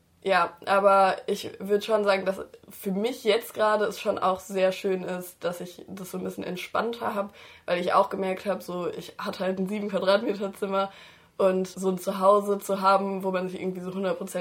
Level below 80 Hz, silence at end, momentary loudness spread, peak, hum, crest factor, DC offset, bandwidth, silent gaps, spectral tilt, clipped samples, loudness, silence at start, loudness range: -70 dBFS; 0 s; 12 LU; -6 dBFS; none; 20 dB; under 0.1%; 16.5 kHz; none; -5 dB/octave; under 0.1%; -26 LUFS; 0.25 s; 4 LU